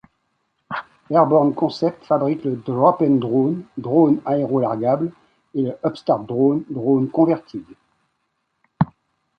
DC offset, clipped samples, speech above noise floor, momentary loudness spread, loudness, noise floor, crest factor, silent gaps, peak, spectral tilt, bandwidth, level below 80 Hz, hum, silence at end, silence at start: under 0.1%; under 0.1%; 54 dB; 12 LU; -19 LUFS; -72 dBFS; 18 dB; none; -2 dBFS; -9.5 dB/octave; 6.4 kHz; -60 dBFS; none; 0.55 s; 0.7 s